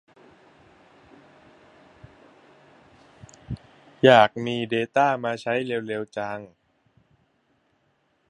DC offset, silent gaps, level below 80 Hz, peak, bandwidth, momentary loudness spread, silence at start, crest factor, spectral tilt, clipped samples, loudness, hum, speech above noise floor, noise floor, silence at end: under 0.1%; none; -58 dBFS; 0 dBFS; 10.5 kHz; 22 LU; 3.5 s; 26 dB; -6 dB/octave; under 0.1%; -22 LUFS; none; 47 dB; -68 dBFS; 1.85 s